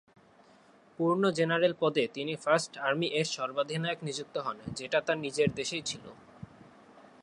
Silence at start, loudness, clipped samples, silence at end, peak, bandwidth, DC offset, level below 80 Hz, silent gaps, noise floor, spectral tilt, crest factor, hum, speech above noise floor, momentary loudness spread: 1 s; -31 LUFS; under 0.1%; 0.2 s; -12 dBFS; 11.5 kHz; under 0.1%; -68 dBFS; none; -60 dBFS; -4.5 dB/octave; 20 dB; none; 29 dB; 13 LU